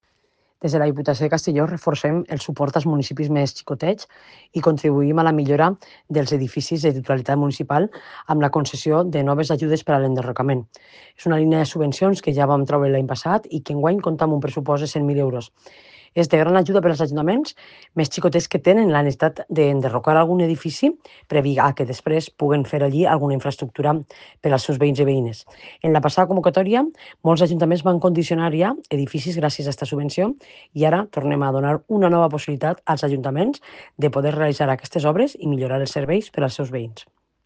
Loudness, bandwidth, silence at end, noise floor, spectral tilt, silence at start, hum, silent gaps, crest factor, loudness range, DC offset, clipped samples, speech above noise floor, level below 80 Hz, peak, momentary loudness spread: -20 LUFS; 9.2 kHz; 0.45 s; -66 dBFS; -7 dB/octave; 0.6 s; none; none; 20 dB; 3 LU; under 0.1%; under 0.1%; 46 dB; -58 dBFS; 0 dBFS; 7 LU